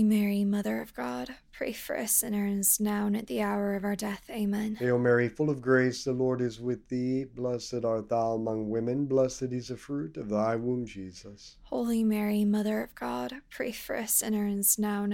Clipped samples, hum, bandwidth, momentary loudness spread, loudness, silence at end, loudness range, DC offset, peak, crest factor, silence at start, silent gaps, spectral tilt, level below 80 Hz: under 0.1%; none; 17 kHz; 11 LU; -29 LUFS; 0 s; 3 LU; under 0.1%; -10 dBFS; 18 dB; 0 s; none; -5 dB/octave; -58 dBFS